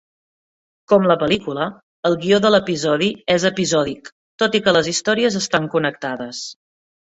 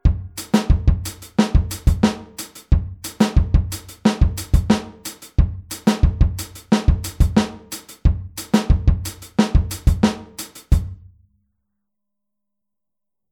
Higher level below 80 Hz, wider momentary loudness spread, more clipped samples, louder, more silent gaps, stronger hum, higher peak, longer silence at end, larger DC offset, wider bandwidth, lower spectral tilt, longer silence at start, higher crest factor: second, -56 dBFS vs -22 dBFS; about the same, 12 LU vs 13 LU; neither; about the same, -18 LUFS vs -20 LUFS; first, 1.83-2.03 s, 4.12-4.39 s vs none; neither; about the same, -2 dBFS vs -2 dBFS; second, 0.55 s vs 2.35 s; neither; second, 8.4 kHz vs 19 kHz; second, -4 dB/octave vs -6 dB/octave; first, 0.9 s vs 0.05 s; about the same, 18 dB vs 18 dB